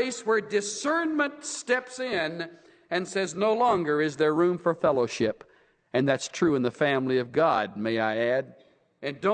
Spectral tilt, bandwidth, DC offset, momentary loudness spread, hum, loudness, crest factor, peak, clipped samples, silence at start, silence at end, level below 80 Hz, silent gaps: -4.5 dB/octave; 9.6 kHz; under 0.1%; 8 LU; none; -26 LUFS; 16 dB; -10 dBFS; under 0.1%; 0 s; 0 s; -68 dBFS; none